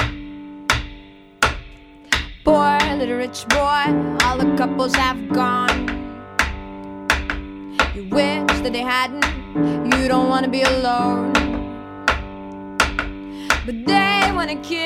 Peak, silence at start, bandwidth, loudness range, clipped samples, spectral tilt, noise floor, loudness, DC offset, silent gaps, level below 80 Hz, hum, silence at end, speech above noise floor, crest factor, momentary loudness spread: -2 dBFS; 0 s; 16.5 kHz; 3 LU; under 0.1%; -4 dB/octave; -42 dBFS; -19 LUFS; under 0.1%; none; -34 dBFS; none; 0 s; 23 dB; 18 dB; 12 LU